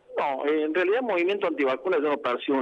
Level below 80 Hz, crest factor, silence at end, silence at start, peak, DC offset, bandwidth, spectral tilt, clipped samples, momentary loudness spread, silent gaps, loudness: -76 dBFS; 12 dB; 0 s; 0.1 s; -14 dBFS; under 0.1%; 7.4 kHz; -6 dB/octave; under 0.1%; 3 LU; none; -25 LUFS